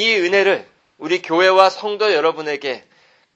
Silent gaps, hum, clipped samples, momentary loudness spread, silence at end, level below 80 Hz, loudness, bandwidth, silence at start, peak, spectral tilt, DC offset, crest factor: none; none; under 0.1%; 13 LU; 0.55 s; -66 dBFS; -16 LUFS; 8.4 kHz; 0 s; 0 dBFS; -3.5 dB/octave; under 0.1%; 18 dB